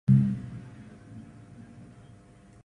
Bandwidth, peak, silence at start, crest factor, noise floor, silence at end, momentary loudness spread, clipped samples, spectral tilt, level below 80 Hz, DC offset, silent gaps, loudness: 3.6 kHz; -10 dBFS; 0.1 s; 20 dB; -54 dBFS; 1.05 s; 27 LU; under 0.1%; -10 dB/octave; -54 dBFS; under 0.1%; none; -27 LUFS